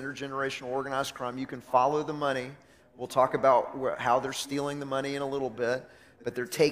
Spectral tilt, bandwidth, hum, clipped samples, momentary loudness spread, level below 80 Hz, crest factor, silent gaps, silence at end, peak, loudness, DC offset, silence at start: -4.5 dB/octave; 15.5 kHz; none; under 0.1%; 11 LU; -66 dBFS; 20 dB; none; 0 s; -10 dBFS; -30 LUFS; under 0.1%; 0 s